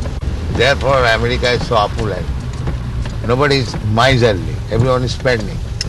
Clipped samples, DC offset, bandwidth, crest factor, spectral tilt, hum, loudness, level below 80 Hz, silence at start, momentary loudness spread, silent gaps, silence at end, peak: under 0.1%; under 0.1%; 12 kHz; 14 dB; -5.5 dB/octave; none; -16 LUFS; -24 dBFS; 0 s; 10 LU; none; 0 s; -2 dBFS